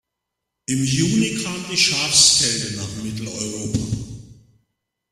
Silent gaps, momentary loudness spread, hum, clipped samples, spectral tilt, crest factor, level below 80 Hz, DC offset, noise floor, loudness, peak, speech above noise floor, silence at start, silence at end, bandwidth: none; 16 LU; none; under 0.1%; -2.5 dB/octave; 22 dB; -48 dBFS; under 0.1%; -81 dBFS; -18 LUFS; 0 dBFS; 61 dB; 0.7 s; 0.8 s; 15 kHz